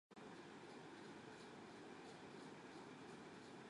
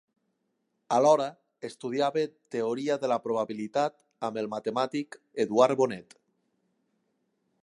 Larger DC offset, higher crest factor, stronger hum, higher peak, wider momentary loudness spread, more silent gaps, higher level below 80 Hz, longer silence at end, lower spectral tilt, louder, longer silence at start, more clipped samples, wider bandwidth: neither; second, 12 dB vs 22 dB; neither; second, -46 dBFS vs -8 dBFS; second, 1 LU vs 13 LU; neither; second, -86 dBFS vs -80 dBFS; second, 0 s vs 1.6 s; about the same, -4.5 dB/octave vs -5 dB/octave; second, -58 LUFS vs -28 LUFS; second, 0.1 s vs 0.9 s; neither; about the same, 11 kHz vs 11.5 kHz